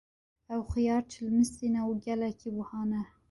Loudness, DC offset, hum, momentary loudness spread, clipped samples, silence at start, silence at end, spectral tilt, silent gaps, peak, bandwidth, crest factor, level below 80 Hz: -32 LUFS; under 0.1%; none; 9 LU; under 0.1%; 0.5 s; 0.25 s; -6.5 dB/octave; none; -16 dBFS; 11.5 kHz; 14 dB; -52 dBFS